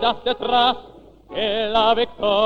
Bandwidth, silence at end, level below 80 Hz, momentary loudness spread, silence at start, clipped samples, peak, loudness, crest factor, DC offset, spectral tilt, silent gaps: 7 kHz; 0 s; -48 dBFS; 9 LU; 0 s; under 0.1%; -4 dBFS; -20 LUFS; 16 dB; under 0.1%; -5 dB/octave; none